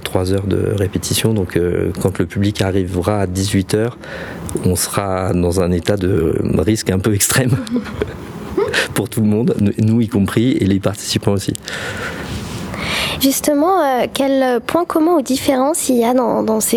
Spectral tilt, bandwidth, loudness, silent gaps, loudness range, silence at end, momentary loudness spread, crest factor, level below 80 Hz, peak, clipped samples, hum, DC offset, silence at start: -5 dB/octave; 20 kHz; -17 LUFS; none; 3 LU; 0 s; 9 LU; 16 dB; -40 dBFS; 0 dBFS; under 0.1%; none; under 0.1%; 0 s